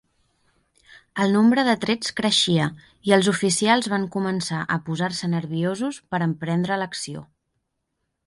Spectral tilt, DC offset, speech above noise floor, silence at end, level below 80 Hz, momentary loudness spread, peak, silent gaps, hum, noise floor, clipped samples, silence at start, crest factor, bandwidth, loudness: -4.5 dB/octave; under 0.1%; 55 dB; 1.05 s; -62 dBFS; 10 LU; -2 dBFS; none; none; -77 dBFS; under 0.1%; 1.15 s; 20 dB; 11.5 kHz; -22 LUFS